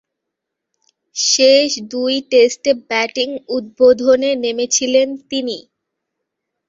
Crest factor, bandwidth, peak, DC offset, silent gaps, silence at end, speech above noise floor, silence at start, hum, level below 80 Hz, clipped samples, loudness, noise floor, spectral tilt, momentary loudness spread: 16 dB; 7.8 kHz; 0 dBFS; under 0.1%; none; 1.05 s; 64 dB; 1.15 s; none; -62 dBFS; under 0.1%; -15 LUFS; -79 dBFS; -1 dB/octave; 11 LU